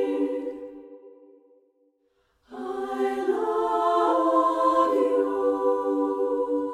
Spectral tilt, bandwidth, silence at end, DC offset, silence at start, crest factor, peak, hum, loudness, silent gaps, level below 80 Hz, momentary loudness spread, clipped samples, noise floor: -4.5 dB/octave; 11 kHz; 0 s; under 0.1%; 0 s; 16 dB; -10 dBFS; none; -24 LUFS; none; -66 dBFS; 15 LU; under 0.1%; -69 dBFS